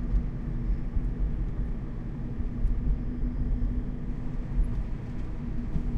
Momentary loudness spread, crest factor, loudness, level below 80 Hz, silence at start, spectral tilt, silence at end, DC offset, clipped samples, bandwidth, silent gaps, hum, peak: 5 LU; 14 dB; -34 LUFS; -30 dBFS; 0 s; -10 dB/octave; 0 s; under 0.1%; under 0.1%; 3.6 kHz; none; none; -14 dBFS